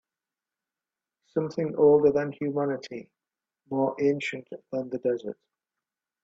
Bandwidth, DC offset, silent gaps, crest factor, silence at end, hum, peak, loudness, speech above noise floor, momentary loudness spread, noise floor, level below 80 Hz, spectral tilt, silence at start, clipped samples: 7.8 kHz; under 0.1%; none; 18 dB; 0.9 s; none; -10 dBFS; -27 LUFS; over 64 dB; 19 LU; under -90 dBFS; -70 dBFS; -7.5 dB/octave; 1.35 s; under 0.1%